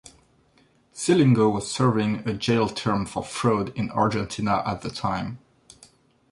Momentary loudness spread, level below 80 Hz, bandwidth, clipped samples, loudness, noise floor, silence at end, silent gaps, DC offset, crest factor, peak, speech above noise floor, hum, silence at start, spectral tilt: 11 LU; -52 dBFS; 11.5 kHz; under 0.1%; -24 LUFS; -61 dBFS; 0.95 s; none; under 0.1%; 18 dB; -6 dBFS; 38 dB; none; 0.05 s; -6 dB/octave